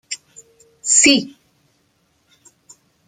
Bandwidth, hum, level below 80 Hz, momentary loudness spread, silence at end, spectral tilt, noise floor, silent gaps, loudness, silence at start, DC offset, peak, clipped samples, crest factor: 14.5 kHz; none; -60 dBFS; 21 LU; 1.8 s; -0.5 dB/octave; -63 dBFS; none; -13 LUFS; 0.1 s; under 0.1%; 0 dBFS; under 0.1%; 22 dB